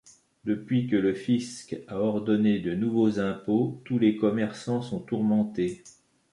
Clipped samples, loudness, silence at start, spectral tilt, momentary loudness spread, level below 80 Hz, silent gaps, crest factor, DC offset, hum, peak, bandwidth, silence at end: under 0.1%; -27 LUFS; 0.45 s; -7 dB/octave; 8 LU; -62 dBFS; none; 16 dB; under 0.1%; none; -10 dBFS; 11 kHz; 0.45 s